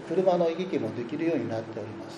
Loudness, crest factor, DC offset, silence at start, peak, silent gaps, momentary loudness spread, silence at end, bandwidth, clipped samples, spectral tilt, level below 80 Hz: -29 LUFS; 18 dB; under 0.1%; 0 s; -10 dBFS; none; 11 LU; 0 s; 10 kHz; under 0.1%; -7.5 dB/octave; -70 dBFS